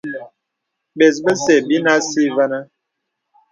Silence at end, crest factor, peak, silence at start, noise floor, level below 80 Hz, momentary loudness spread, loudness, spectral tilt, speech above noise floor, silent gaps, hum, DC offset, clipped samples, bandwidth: 0.85 s; 18 dB; 0 dBFS; 0.05 s; -77 dBFS; -66 dBFS; 13 LU; -15 LUFS; -4 dB/octave; 62 dB; none; none; under 0.1%; under 0.1%; 9.4 kHz